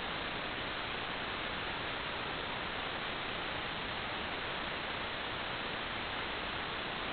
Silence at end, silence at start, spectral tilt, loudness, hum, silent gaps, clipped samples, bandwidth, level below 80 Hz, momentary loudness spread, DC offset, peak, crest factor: 0 s; 0 s; -1 dB/octave; -38 LUFS; none; none; under 0.1%; 4.9 kHz; -56 dBFS; 0 LU; under 0.1%; -24 dBFS; 14 dB